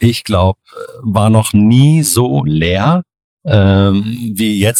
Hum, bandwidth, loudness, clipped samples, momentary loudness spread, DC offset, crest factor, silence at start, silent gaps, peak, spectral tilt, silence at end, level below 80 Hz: none; 16.5 kHz; -12 LUFS; under 0.1%; 10 LU; under 0.1%; 12 dB; 0 s; 3.24-3.37 s; 0 dBFS; -5.5 dB/octave; 0 s; -38 dBFS